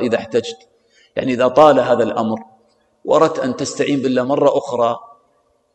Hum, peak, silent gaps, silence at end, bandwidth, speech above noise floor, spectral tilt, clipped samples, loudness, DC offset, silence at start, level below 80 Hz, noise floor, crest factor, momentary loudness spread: none; 0 dBFS; none; 0.7 s; 9.2 kHz; 45 dB; -5.5 dB/octave; under 0.1%; -16 LUFS; under 0.1%; 0 s; -60 dBFS; -61 dBFS; 18 dB; 15 LU